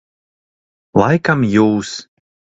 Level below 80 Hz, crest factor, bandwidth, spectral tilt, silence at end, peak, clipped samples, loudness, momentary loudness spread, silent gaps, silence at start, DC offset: -48 dBFS; 18 dB; 8 kHz; -6.5 dB/octave; 0.5 s; 0 dBFS; under 0.1%; -15 LUFS; 12 LU; none; 0.95 s; under 0.1%